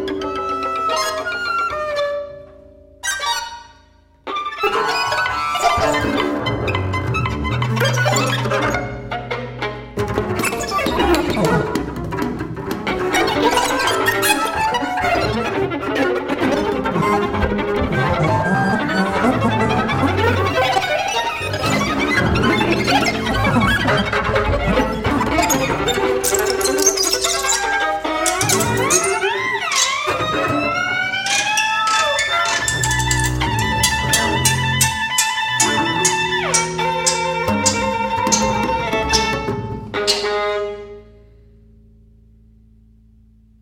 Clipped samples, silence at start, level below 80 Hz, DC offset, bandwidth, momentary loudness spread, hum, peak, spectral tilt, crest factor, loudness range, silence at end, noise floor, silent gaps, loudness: under 0.1%; 0 s; -36 dBFS; under 0.1%; 17 kHz; 7 LU; none; 0 dBFS; -3.5 dB/octave; 18 dB; 5 LU; 2.55 s; -50 dBFS; none; -18 LUFS